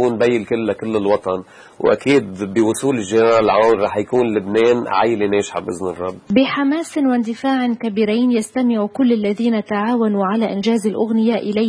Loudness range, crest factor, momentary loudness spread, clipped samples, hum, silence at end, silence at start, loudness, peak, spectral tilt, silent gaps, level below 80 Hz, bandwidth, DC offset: 2 LU; 16 dB; 6 LU; under 0.1%; none; 0 s; 0 s; -17 LUFS; -2 dBFS; -5.5 dB/octave; none; -56 dBFS; 11 kHz; under 0.1%